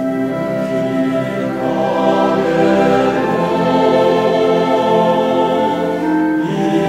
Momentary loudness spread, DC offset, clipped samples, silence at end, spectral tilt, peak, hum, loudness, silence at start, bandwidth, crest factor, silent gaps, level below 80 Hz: 6 LU; 0.1%; under 0.1%; 0 s; -7 dB/octave; 0 dBFS; none; -15 LUFS; 0 s; 15.5 kHz; 14 dB; none; -48 dBFS